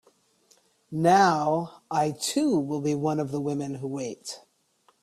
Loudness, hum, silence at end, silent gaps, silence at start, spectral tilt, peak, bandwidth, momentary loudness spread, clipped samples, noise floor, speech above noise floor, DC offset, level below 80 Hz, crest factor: -26 LUFS; none; 0.65 s; none; 0.9 s; -5 dB/octave; -8 dBFS; 14.5 kHz; 15 LU; under 0.1%; -66 dBFS; 41 dB; under 0.1%; -66 dBFS; 20 dB